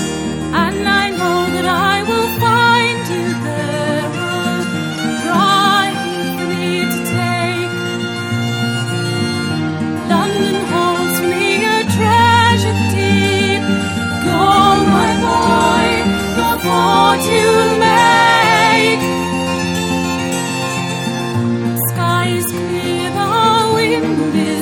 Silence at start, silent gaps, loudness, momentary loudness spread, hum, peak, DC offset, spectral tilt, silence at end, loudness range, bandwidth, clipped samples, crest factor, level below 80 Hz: 0 s; none; -14 LUFS; 9 LU; none; 0 dBFS; under 0.1%; -4.5 dB/octave; 0 s; 6 LU; 18 kHz; under 0.1%; 14 dB; -42 dBFS